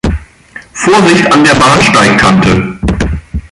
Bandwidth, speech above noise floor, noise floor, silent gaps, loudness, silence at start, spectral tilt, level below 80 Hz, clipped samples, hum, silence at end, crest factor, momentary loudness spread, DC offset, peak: 11.5 kHz; 27 dB; -33 dBFS; none; -7 LUFS; 0.05 s; -4.5 dB/octave; -22 dBFS; 0.2%; none; 0.05 s; 8 dB; 12 LU; under 0.1%; 0 dBFS